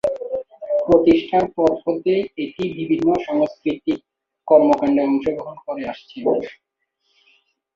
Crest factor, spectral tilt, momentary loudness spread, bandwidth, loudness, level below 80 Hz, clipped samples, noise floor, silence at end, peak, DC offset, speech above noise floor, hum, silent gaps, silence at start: 18 dB; -7.5 dB/octave; 14 LU; 7.4 kHz; -20 LUFS; -52 dBFS; under 0.1%; -70 dBFS; 1.25 s; -2 dBFS; under 0.1%; 52 dB; none; none; 0.05 s